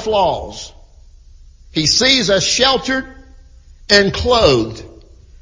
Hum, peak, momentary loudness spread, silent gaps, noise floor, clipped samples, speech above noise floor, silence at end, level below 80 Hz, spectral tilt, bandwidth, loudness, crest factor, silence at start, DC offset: none; 0 dBFS; 17 LU; none; -42 dBFS; under 0.1%; 28 dB; 0.5 s; -36 dBFS; -3 dB/octave; 7.8 kHz; -14 LUFS; 16 dB; 0 s; under 0.1%